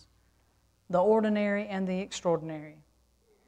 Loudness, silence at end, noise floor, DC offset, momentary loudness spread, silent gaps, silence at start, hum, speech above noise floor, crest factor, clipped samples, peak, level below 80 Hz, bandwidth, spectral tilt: -29 LUFS; 0.75 s; -68 dBFS; under 0.1%; 16 LU; none; 0.9 s; none; 40 dB; 16 dB; under 0.1%; -14 dBFS; -68 dBFS; 9.4 kHz; -6 dB/octave